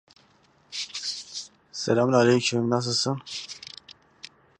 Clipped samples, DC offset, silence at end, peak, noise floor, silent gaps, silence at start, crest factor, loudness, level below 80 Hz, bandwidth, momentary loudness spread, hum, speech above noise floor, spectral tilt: under 0.1%; under 0.1%; 0.35 s; -6 dBFS; -61 dBFS; none; 0.7 s; 22 dB; -25 LUFS; -68 dBFS; 11 kHz; 23 LU; none; 38 dB; -4.5 dB/octave